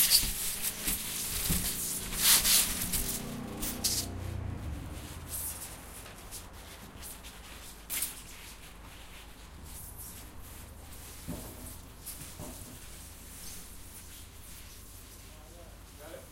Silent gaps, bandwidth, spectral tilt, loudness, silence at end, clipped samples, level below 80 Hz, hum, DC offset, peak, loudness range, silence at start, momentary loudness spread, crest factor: none; 16 kHz; -1.5 dB/octave; -30 LUFS; 0 s; under 0.1%; -48 dBFS; none; under 0.1%; -8 dBFS; 18 LU; 0 s; 22 LU; 26 dB